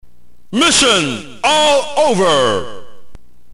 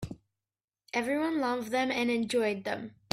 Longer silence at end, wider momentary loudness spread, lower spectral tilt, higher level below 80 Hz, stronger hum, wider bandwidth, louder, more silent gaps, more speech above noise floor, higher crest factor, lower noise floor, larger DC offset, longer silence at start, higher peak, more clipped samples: second, 0 s vs 0.25 s; about the same, 12 LU vs 10 LU; second, -2.5 dB/octave vs -4.5 dB/octave; first, -44 dBFS vs -64 dBFS; neither; first, 16 kHz vs 14.5 kHz; first, -13 LUFS vs -31 LUFS; second, none vs 0.64-0.68 s; second, 34 dB vs over 60 dB; second, 14 dB vs 22 dB; second, -47 dBFS vs under -90 dBFS; neither; about the same, 0 s vs 0 s; first, -2 dBFS vs -10 dBFS; neither